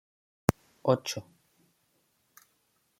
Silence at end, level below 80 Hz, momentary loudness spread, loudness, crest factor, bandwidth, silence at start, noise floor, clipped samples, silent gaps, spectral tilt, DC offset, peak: 1.8 s; -58 dBFS; 9 LU; -31 LUFS; 32 dB; 16.5 kHz; 0.5 s; -73 dBFS; under 0.1%; none; -5.5 dB/octave; under 0.1%; -2 dBFS